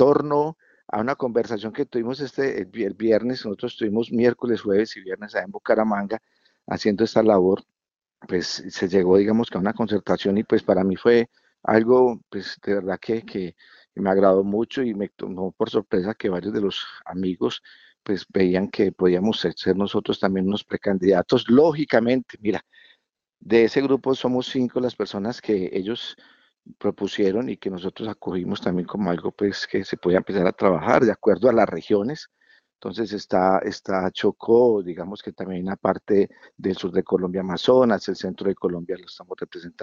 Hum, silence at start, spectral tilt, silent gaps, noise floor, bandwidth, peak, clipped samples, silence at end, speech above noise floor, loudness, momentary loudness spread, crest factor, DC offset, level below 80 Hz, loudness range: none; 0 s; -6.5 dB/octave; none; -68 dBFS; 7.4 kHz; -2 dBFS; under 0.1%; 0 s; 46 dB; -22 LUFS; 13 LU; 20 dB; under 0.1%; -60 dBFS; 5 LU